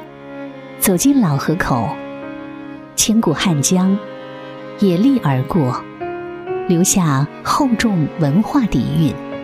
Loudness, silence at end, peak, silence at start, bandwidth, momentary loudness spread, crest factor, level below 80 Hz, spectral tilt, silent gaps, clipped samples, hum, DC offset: -16 LUFS; 0 s; -2 dBFS; 0 s; 15.5 kHz; 18 LU; 16 dB; -42 dBFS; -5 dB/octave; none; under 0.1%; none; under 0.1%